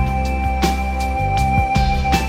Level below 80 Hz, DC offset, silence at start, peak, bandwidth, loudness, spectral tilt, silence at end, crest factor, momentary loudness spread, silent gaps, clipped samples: -22 dBFS; under 0.1%; 0 s; -2 dBFS; 16 kHz; -19 LUFS; -5.5 dB/octave; 0 s; 14 dB; 4 LU; none; under 0.1%